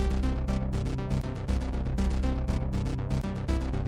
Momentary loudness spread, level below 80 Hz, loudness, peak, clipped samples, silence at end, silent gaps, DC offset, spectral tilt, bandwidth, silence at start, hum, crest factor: 3 LU; -30 dBFS; -31 LUFS; -16 dBFS; under 0.1%; 0 s; none; under 0.1%; -7.5 dB/octave; 10.5 kHz; 0 s; none; 14 dB